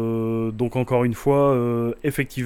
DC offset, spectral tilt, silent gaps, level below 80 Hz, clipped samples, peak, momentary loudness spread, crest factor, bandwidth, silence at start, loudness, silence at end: under 0.1%; -7.5 dB/octave; none; -46 dBFS; under 0.1%; -6 dBFS; 6 LU; 14 dB; 17.5 kHz; 0 s; -22 LUFS; 0 s